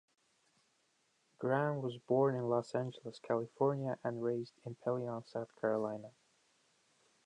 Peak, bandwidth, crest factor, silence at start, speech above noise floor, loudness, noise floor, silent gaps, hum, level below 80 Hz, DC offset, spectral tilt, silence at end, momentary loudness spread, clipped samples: -20 dBFS; 10 kHz; 18 dB; 1.4 s; 40 dB; -37 LUFS; -77 dBFS; none; none; -84 dBFS; under 0.1%; -8 dB/octave; 1.15 s; 11 LU; under 0.1%